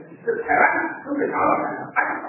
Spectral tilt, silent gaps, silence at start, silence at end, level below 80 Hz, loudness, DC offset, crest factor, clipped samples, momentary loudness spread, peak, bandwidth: -11 dB/octave; none; 0 s; 0 s; -60 dBFS; -21 LUFS; under 0.1%; 20 dB; under 0.1%; 9 LU; -4 dBFS; 2.9 kHz